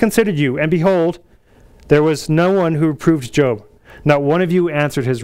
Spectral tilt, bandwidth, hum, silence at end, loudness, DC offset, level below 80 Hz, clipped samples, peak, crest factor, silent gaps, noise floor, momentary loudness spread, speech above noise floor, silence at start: -6.5 dB/octave; 16 kHz; none; 0 s; -16 LUFS; under 0.1%; -44 dBFS; under 0.1%; 0 dBFS; 16 dB; none; -47 dBFS; 4 LU; 32 dB; 0 s